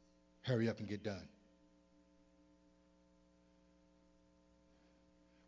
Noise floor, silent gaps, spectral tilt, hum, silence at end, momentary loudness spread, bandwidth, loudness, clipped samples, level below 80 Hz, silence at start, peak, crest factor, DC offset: -71 dBFS; none; -7 dB/octave; none; 4.2 s; 13 LU; 7.6 kHz; -42 LUFS; under 0.1%; -74 dBFS; 0.45 s; -24 dBFS; 24 dB; under 0.1%